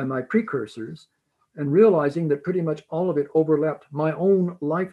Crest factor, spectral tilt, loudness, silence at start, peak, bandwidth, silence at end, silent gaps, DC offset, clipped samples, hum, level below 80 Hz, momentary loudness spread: 18 dB; -9.5 dB/octave; -22 LUFS; 0 s; -4 dBFS; 8.8 kHz; 0 s; none; under 0.1%; under 0.1%; none; -70 dBFS; 12 LU